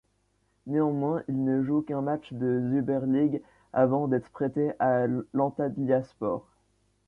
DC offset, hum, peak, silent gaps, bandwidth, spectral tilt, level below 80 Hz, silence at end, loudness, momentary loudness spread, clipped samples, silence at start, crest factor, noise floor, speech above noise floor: under 0.1%; none; -12 dBFS; none; 3.8 kHz; -10.5 dB/octave; -64 dBFS; 0.65 s; -28 LUFS; 7 LU; under 0.1%; 0.65 s; 16 dB; -71 dBFS; 44 dB